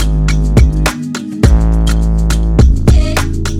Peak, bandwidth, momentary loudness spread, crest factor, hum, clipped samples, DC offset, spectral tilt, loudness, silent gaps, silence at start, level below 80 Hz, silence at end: 0 dBFS; 14 kHz; 6 LU; 10 dB; none; under 0.1%; under 0.1%; -6 dB/octave; -12 LUFS; none; 0 s; -12 dBFS; 0 s